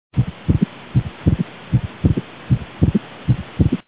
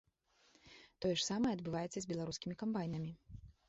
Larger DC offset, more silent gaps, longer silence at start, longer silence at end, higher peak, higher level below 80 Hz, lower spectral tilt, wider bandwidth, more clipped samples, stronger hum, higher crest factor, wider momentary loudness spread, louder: first, 0.3% vs under 0.1%; neither; second, 0.15 s vs 0.65 s; about the same, 0.05 s vs 0.15 s; first, 0 dBFS vs -24 dBFS; first, -30 dBFS vs -66 dBFS; first, -12.5 dB/octave vs -5 dB/octave; second, 4 kHz vs 8 kHz; neither; neither; about the same, 18 dB vs 18 dB; second, 4 LU vs 22 LU; first, -21 LUFS vs -40 LUFS